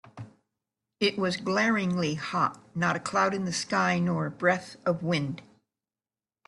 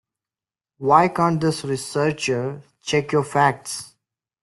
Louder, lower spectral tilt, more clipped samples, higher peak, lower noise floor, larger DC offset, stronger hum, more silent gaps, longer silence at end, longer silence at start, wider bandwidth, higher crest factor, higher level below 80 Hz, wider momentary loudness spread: second, -28 LUFS vs -21 LUFS; about the same, -5 dB/octave vs -5 dB/octave; neither; second, -10 dBFS vs -2 dBFS; about the same, under -90 dBFS vs under -90 dBFS; neither; neither; neither; first, 1.05 s vs 0.55 s; second, 0.05 s vs 0.8 s; about the same, 11.5 kHz vs 12.5 kHz; about the same, 18 dB vs 20 dB; second, -68 dBFS vs -60 dBFS; second, 5 LU vs 14 LU